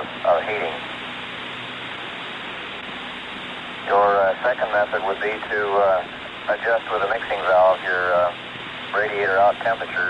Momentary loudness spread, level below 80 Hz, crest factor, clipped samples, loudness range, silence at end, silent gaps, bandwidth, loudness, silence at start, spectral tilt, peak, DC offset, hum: 13 LU; -58 dBFS; 14 dB; under 0.1%; 7 LU; 0 s; none; 10 kHz; -22 LUFS; 0 s; -4.5 dB/octave; -8 dBFS; under 0.1%; none